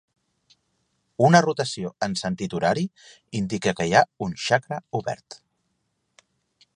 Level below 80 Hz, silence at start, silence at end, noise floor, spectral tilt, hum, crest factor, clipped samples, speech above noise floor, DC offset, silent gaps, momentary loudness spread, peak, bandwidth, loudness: -58 dBFS; 1.2 s; 1.4 s; -74 dBFS; -5 dB/octave; none; 24 dB; under 0.1%; 51 dB; under 0.1%; none; 14 LU; 0 dBFS; 11 kHz; -23 LUFS